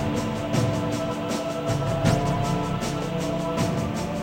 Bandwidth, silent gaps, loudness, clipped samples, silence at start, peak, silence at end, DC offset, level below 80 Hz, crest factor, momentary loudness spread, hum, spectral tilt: 16.5 kHz; none; -26 LUFS; under 0.1%; 0 s; -8 dBFS; 0 s; under 0.1%; -42 dBFS; 18 dB; 5 LU; none; -6 dB/octave